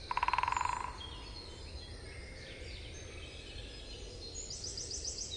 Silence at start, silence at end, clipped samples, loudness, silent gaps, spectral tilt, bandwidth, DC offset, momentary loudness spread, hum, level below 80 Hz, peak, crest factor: 0 s; 0 s; under 0.1%; -41 LUFS; none; -2 dB/octave; 11.5 kHz; under 0.1%; 14 LU; none; -52 dBFS; -16 dBFS; 24 dB